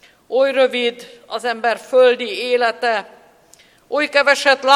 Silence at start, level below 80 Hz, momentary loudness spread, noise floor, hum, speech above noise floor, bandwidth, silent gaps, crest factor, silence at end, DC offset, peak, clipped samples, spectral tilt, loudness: 0.3 s; -70 dBFS; 11 LU; -51 dBFS; none; 34 dB; 13.5 kHz; none; 18 dB; 0 s; under 0.1%; 0 dBFS; under 0.1%; -1.5 dB/octave; -17 LUFS